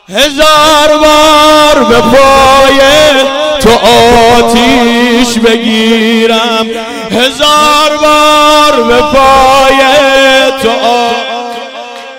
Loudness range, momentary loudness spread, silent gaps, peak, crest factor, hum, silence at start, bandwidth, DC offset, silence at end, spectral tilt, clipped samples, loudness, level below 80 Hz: 3 LU; 7 LU; none; 0 dBFS; 6 dB; none; 0.1 s; 18 kHz; under 0.1%; 0 s; -3 dB/octave; 5%; -4 LUFS; -28 dBFS